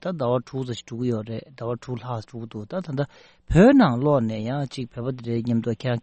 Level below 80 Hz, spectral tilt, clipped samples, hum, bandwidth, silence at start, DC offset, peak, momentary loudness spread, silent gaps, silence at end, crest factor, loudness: -44 dBFS; -8 dB/octave; under 0.1%; none; 8.4 kHz; 0 s; under 0.1%; -4 dBFS; 16 LU; none; 0.05 s; 18 dB; -24 LUFS